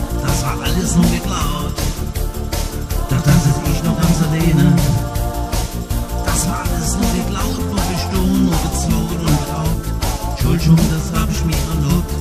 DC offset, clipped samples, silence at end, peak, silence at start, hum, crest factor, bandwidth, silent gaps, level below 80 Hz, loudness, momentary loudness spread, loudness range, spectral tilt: under 0.1%; under 0.1%; 0 s; -2 dBFS; 0 s; none; 14 dB; 15.5 kHz; none; -22 dBFS; -17 LUFS; 9 LU; 3 LU; -5.5 dB/octave